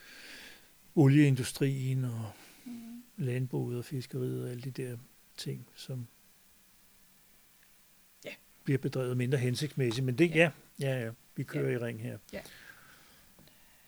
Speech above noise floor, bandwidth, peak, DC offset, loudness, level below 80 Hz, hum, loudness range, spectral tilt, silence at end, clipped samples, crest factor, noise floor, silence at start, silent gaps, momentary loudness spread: 31 dB; over 20 kHz; -8 dBFS; under 0.1%; -32 LUFS; -70 dBFS; none; 14 LU; -6.5 dB/octave; 1.15 s; under 0.1%; 26 dB; -62 dBFS; 0 s; none; 22 LU